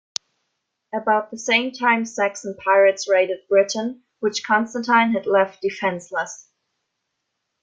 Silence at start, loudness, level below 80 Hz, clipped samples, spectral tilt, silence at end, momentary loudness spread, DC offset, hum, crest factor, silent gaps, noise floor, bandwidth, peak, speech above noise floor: 0.95 s; -20 LUFS; -72 dBFS; under 0.1%; -3 dB/octave; 1.25 s; 11 LU; under 0.1%; none; 20 dB; none; -77 dBFS; 7.8 kHz; 0 dBFS; 57 dB